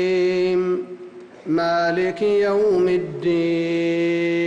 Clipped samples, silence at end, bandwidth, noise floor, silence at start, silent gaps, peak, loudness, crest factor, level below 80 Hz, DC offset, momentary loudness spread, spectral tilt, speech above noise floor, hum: under 0.1%; 0 s; 8.2 kHz; -40 dBFS; 0 s; none; -12 dBFS; -20 LUFS; 8 dB; -60 dBFS; under 0.1%; 9 LU; -6.5 dB/octave; 20 dB; none